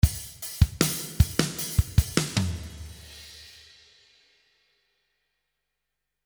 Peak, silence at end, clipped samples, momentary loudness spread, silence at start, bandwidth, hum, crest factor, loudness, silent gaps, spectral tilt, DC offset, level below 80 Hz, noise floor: -2 dBFS; 2.75 s; under 0.1%; 19 LU; 0.05 s; over 20 kHz; 50 Hz at -55 dBFS; 26 dB; -26 LUFS; none; -4.5 dB/octave; under 0.1%; -34 dBFS; -84 dBFS